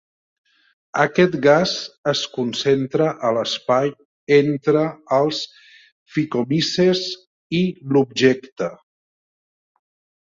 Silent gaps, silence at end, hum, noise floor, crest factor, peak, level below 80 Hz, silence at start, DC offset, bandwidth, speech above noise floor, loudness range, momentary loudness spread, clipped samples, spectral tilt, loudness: 1.98-2.04 s, 4.05-4.27 s, 5.92-6.06 s, 7.27-7.50 s, 8.52-8.56 s; 1.55 s; none; under -90 dBFS; 18 dB; -2 dBFS; -62 dBFS; 0.95 s; under 0.1%; 7.8 kHz; over 71 dB; 2 LU; 11 LU; under 0.1%; -5.5 dB/octave; -20 LUFS